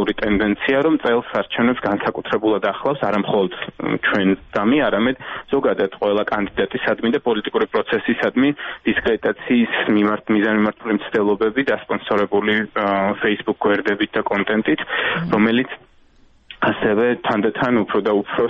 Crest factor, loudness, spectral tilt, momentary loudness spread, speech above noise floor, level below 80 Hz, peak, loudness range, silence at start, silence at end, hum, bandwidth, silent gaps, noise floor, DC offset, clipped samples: 16 dB; -19 LUFS; -7.5 dB/octave; 4 LU; 33 dB; -48 dBFS; -4 dBFS; 1 LU; 0 s; 0 s; none; 6.4 kHz; none; -52 dBFS; under 0.1%; under 0.1%